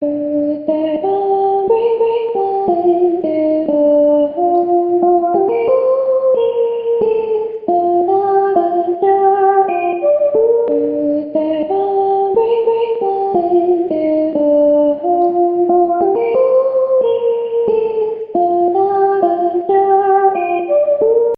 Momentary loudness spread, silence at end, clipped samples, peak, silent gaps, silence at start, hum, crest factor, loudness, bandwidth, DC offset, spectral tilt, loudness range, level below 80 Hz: 5 LU; 0 s; under 0.1%; -2 dBFS; none; 0 s; none; 12 dB; -14 LUFS; 4.7 kHz; under 0.1%; -10 dB/octave; 2 LU; -58 dBFS